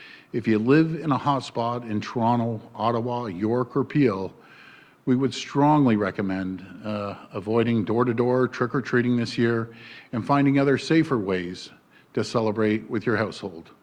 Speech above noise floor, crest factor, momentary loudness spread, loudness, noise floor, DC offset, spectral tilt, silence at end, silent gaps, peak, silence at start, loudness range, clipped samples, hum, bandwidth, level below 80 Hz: 27 dB; 16 dB; 13 LU; -24 LUFS; -50 dBFS; under 0.1%; -7 dB/octave; 0.2 s; none; -6 dBFS; 0 s; 2 LU; under 0.1%; none; 9.8 kHz; -62 dBFS